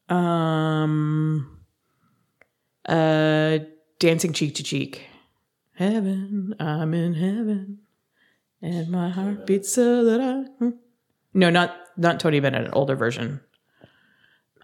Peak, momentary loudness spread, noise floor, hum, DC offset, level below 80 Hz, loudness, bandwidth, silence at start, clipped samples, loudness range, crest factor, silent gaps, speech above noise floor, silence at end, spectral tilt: -2 dBFS; 11 LU; -70 dBFS; none; under 0.1%; -70 dBFS; -23 LUFS; 15.5 kHz; 0.1 s; under 0.1%; 5 LU; 20 dB; none; 48 dB; 1.25 s; -5.5 dB/octave